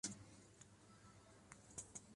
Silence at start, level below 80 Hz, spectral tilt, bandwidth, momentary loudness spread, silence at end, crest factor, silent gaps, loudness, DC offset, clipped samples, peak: 0.05 s; -76 dBFS; -2.5 dB/octave; 11.5 kHz; 12 LU; 0 s; 26 dB; none; -58 LUFS; under 0.1%; under 0.1%; -32 dBFS